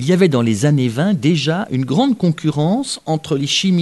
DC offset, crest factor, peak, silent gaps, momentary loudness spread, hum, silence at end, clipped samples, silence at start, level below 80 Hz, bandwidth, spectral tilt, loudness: 0.1%; 14 dB; -2 dBFS; none; 6 LU; none; 0 s; under 0.1%; 0 s; -56 dBFS; 12 kHz; -5.5 dB/octave; -16 LUFS